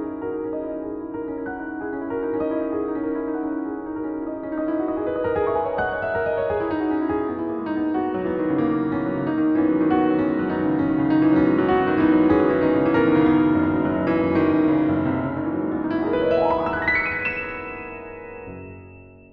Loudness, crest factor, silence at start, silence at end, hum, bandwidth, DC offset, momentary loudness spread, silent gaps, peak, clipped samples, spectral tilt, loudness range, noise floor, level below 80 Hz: -22 LUFS; 16 dB; 0 s; 0.15 s; none; 4.9 kHz; under 0.1%; 12 LU; none; -6 dBFS; under 0.1%; -10 dB/octave; 8 LU; -44 dBFS; -48 dBFS